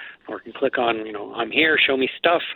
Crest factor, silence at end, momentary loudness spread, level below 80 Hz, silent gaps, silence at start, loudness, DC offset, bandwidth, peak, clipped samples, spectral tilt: 18 dB; 0 s; 18 LU; -62 dBFS; none; 0 s; -20 LUFS; under 0.1%; 19 kHz; -4 dBFS; under 0.1%; -7.5 dB/octave